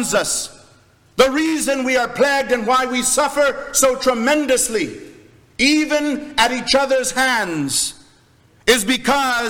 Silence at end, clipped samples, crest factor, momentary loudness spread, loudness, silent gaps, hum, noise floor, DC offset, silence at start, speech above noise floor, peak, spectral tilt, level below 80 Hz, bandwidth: 0 s; under 0.1%; 16 dB; 6 LU; -17 LUFS; none; none; -53 dBFS; under 0.1%; 0 s; 35 dB; -2 dBFS; -2 dB/octave; -48 dBFS; over 20 kHz